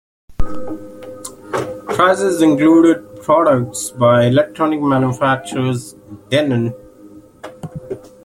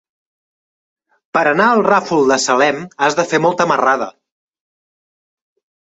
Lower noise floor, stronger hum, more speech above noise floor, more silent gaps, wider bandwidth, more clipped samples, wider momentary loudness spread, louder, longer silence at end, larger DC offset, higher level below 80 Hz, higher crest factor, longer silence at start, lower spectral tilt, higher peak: second, -41 dBFS vs under -90 dBFS; neither; second, 27 dB vs over 76 dB; neither; first, 16 kHz vs 8.2 kHz; neither; first, 20 LU vs 5 LU; about the same, -15 LUFS vs -14 LUFS; second, 0.25 s vs 1.75 s; neither; first, -38 dBFS vs -62 dBFS; about the same, 14 dB vs 16 dB; second, 0.3 s vs 1.35 s; first, -6 dB/octave vs -4 dB/octave; about the same, -2 dBFS vs -2 dBFS